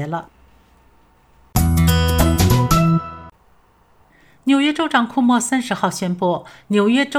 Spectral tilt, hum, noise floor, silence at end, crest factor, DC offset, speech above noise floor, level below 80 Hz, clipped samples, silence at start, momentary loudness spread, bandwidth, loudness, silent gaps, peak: -5.5 dB/octave; none; -54 dBFS; 0 s; 18 dB; under 0.1%; 36 dB; -30 dBFS; under 0.1%; 0 s; 11 LU; 16.5 kHz; -17 LUFS; none; 0 dBFS